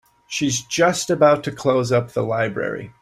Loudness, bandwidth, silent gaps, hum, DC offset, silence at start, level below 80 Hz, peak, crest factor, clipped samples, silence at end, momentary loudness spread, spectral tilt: -20 LUFS; 15 kHz; none; none; under 0.1%; 0.3 s; -56 dBFS; -2 dBFS; 18 dB; under 0.1%; 0.1 s; 9 LU; -4.5 dB/octave